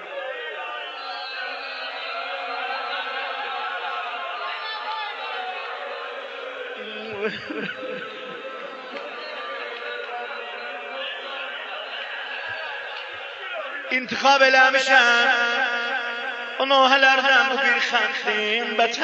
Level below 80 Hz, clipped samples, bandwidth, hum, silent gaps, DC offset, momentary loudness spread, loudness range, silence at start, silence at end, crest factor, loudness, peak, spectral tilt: -80 dBFS; under 0.1%; 8.4 kHz; none; none; under 0.1%; 17 LU; 13 LU; 0 s; 0 s; 22 dB; -23 LUFS; -2 dBFS; -1.5 dB/octave